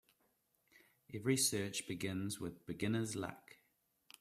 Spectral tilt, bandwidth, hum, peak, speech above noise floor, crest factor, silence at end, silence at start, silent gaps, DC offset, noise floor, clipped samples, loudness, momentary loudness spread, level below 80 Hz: -4 dB/octave; 15.5 kHz; none; -20 dBFS; 40 dB; 22 dB; 0.65 s; 1.1 s; none; under 0.1%; -80 dBFS; under 0.1%; -39 LUFS; 13 LU; -74 dBFS